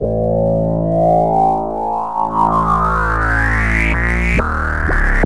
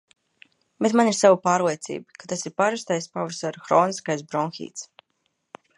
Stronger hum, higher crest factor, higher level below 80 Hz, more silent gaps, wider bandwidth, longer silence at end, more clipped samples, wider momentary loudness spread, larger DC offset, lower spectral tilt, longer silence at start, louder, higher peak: neither; second, 14 dB vs 20 dB; first, -22 dBFS vs -74 dBFS; neither; about the same, 11 kHz vs 11.5 kHz; second, 0 s vs 0.95 s; neither; second, 5 LU vs 17 LU; first, 2% vs under 0.1%; first, -7.5 dB/octave vs -4.5 dB/octave; second, 0 s vs 0.8 s; first, -15 LUFS vs -23 LUFS; first, 0 dBFS vs -4 dBFS